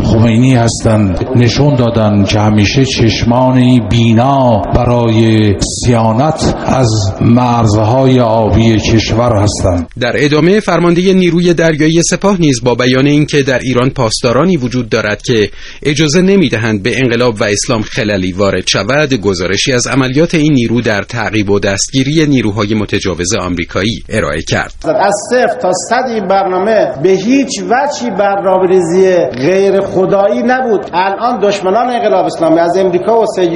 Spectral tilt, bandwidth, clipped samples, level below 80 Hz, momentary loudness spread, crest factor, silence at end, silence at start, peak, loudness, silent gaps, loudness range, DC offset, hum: -5.5 dB/octave; 11 kHz; 0.4%; -30 dBFS; 5 LU; 10 dB; 0 s; 0 s; 0 dBFS; -10 LUFS; none; 3 LU; under 0.1%; none